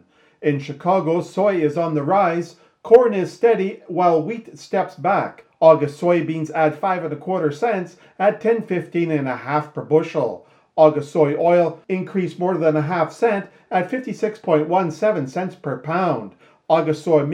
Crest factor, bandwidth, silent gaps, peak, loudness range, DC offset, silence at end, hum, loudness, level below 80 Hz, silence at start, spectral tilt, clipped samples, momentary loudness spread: 20 dB; 10.5 kHz; none; 0 dBFS; 3 LU; under 0.1%; 0 s; none; -20 LUFS; -72 dBFS; 0.4 s; -7.5 dB/octave; under 0.1%; 11 LU